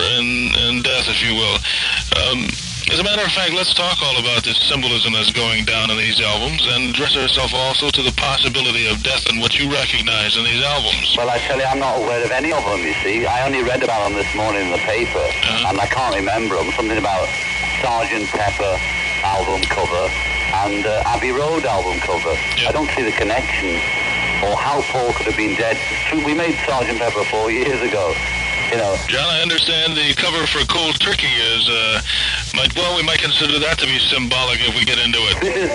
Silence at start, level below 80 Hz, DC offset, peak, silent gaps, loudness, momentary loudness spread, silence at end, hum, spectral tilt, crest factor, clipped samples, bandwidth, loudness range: 0 s; -34 dBFS; under 0.1%; 0 dBFS; none; -16 LUFS; 4 LU; 0 s; none; -3 dB/octave; 18 dB; under 0.1%; 11.5 kHz; 3 LU